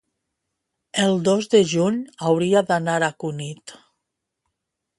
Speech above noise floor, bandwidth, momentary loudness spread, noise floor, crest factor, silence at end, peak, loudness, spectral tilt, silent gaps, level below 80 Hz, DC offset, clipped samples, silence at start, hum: 60 dB; 11.5 kHz; 12 LU; -80 dBFS; 18 dB; 1.25 s; -4 dBFS; -20 LUFS; -5 dB/octave; none; -66 dBFS; under 0.1%; under 0.1%; 0.95 s; none